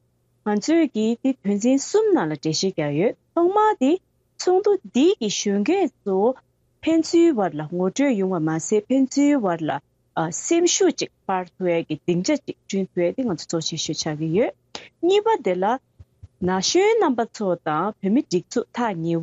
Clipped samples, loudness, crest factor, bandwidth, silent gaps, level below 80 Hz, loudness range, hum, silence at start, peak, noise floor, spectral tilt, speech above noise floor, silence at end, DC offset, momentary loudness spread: under 0.1%; -22 LUFS; 14 dB; 8.2 kHz; none; -66 dBFS; 3 LU; none; 0.45 s; -8 dBFS; -48 dBFS; -4.5 dB/octave; 27 dB; 0 s; under 0.1%; 8 LU